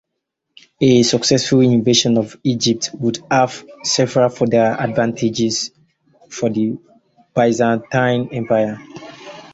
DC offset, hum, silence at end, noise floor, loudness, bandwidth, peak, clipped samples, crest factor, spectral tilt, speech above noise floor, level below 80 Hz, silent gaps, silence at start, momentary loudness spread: under 0.1%; none; 0.1 s; -76 dBFS; -17 LUFS; 8 kHz; -2 dBFS; under 0.1%; 16 dB; -4.5 dB/octave; 60 dB; -54 dBFS; none; 0.8 s; 11 LU